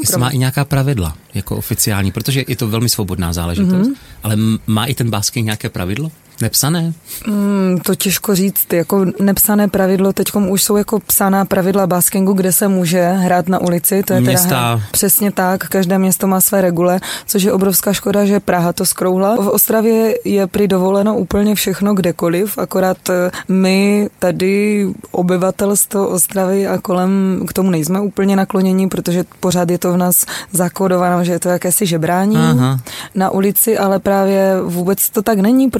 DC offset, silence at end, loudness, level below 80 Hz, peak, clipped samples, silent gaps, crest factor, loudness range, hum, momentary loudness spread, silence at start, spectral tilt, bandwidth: under 0.1%; 0 s; -14 LUFS; -42 dBFS; 0 dBFS; under 0.1%; none; 14 dB; 4 LU; none; 6 LU; 0 s; -5 dB/octave; 17 kHz